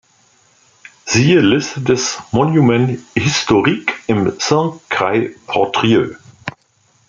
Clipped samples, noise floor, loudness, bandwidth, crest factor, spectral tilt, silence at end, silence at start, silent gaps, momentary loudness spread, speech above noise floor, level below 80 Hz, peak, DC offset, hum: under 0.1%; -57 dBFS; -15 LUFS; 9.4 kHz; 16 dB; -5 dB/octave; 0.6 s; 1.05 s; none; 9 LU; 42 dB; -50 dBFS; 0 dBFS; under 0.1%; none